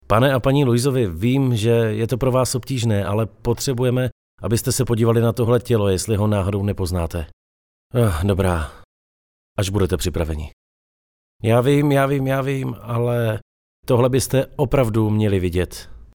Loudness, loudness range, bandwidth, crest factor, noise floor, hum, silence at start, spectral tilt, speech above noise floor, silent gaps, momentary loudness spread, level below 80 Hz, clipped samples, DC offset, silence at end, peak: -20 LUFS; 4 LU; 19.5 kHz; 18 dB; under -90 dBFS; none; 0.1 s; -6 dB/octave; over 71 dB; 4.12-4.38 s, 7.33-7.90 s, 8.84-9.56 s, 10.53-11.40 s, 13.42-13.83 s; 9 LU; -38 dBFS; under 0.1%; under 0.1%; 0.1 s; -2 dBFS